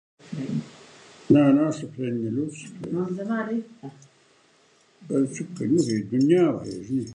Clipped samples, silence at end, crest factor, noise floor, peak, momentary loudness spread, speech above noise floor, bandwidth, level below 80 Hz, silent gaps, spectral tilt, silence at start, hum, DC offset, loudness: under 0.1%; 0 s; 20 dB; -60 dBFS; -4 dBFS; 17 LU; 36 dB; 10.5 kHz; -64 dBFS; none; -7 dB/octave; 0.25 s; none; under 0.1%; -24 LUFS